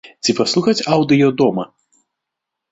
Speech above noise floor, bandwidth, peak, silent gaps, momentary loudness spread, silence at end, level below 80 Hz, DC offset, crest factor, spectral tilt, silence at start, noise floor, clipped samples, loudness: 66 dB; 8.2 kHz; 0 dBFS; none; 9 LU; 1.05 s; -58 dBFS; under 0.1%; 16 dB; -5 dB/octave; 0.05 s; -81 dBFS; under 0.1%; -16 LUFS